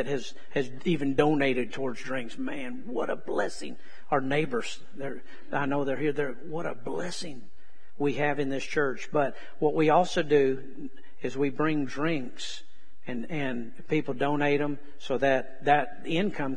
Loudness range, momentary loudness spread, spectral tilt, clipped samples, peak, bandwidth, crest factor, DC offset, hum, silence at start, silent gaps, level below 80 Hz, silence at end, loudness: 5 LU; 14 LU; -5.5 dB/octave; under 0.1%; -8 dBFS; 10.5 kHz; 22 dB; 3%; none; 0 s; none; -62 dBFS; 0 s; -29 LUFS